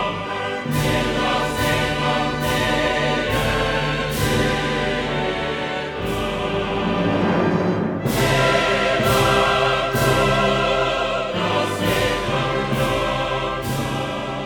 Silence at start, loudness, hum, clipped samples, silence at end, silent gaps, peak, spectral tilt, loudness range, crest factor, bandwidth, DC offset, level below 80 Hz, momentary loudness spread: 0 s; -20 LUFS; none; under 0.1%; 0 s; none; -2 dBFS; -5 dB/octave; 4 LU; 18 dB; over 20 kHz; under 0.1%; -36 dBFS; 7 LU